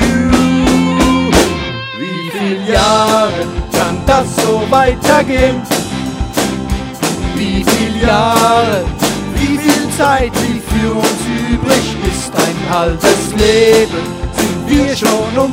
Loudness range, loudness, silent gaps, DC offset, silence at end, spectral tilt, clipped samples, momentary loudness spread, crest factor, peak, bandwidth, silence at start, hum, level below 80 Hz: 2 LU; -12 LUFS; none; under 0.1%; 0 s; -4.5 dB/octave; 0.2%; 8 LU; 12 dB; 0 dBFS; 16.5 kHz; 0 s; none; -26 dBFS